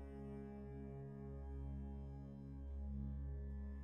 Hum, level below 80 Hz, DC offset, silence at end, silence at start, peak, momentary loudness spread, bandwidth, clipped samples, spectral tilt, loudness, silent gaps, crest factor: none; -50 dBFS; under 0.1%; 0 s; 0 s; -36 dBFS; 5 LU; 3.3 kHz; under 0.1%; -10.5 dB/octave; -51 LUFS; none; 12 dB